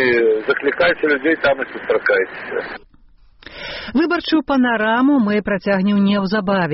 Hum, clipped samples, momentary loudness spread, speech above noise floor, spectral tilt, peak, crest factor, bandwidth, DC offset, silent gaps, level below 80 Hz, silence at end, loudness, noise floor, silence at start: none; under 0.1%; 11 LU; 31 dB; -4 dB/octave; -4 dBFS; 12 dB; 6 kHz; under 0.1%; none; -48 dBFS; 0 s; -17 LUFS; -48 dBFS; 0 s